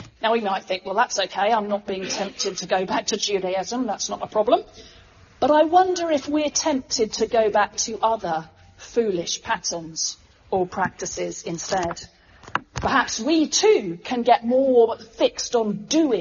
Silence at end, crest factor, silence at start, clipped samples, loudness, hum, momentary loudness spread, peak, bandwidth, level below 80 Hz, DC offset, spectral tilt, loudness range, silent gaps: 0 s; 20 dB; 0 s; under 0.1%; -22 LUFS; none; 10 LU; -2 dBFS; 7.4 kHz; -54 dBFS; under 0.1%; -2.5 dB/octave; 6 LU; none